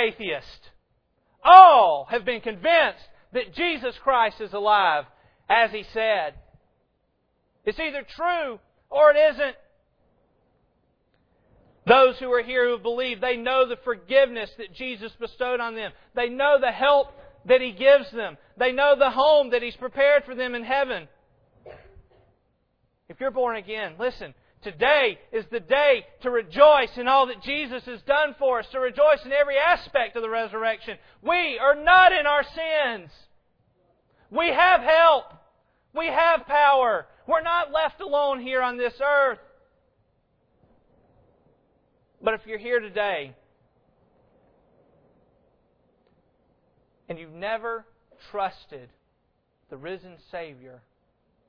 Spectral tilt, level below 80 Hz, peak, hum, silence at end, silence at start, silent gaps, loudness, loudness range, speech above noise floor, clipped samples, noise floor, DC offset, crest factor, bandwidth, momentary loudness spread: -5.5 dB/octave; -56 dBFS; 0 dBFS; none; 0.95 s; 0 s; none; -21 LUFS; 14 LU; 49 dB; under 0.1%; -71 dBFS; under 0.1%; 24 dB; 5.4 kHz; 17 LU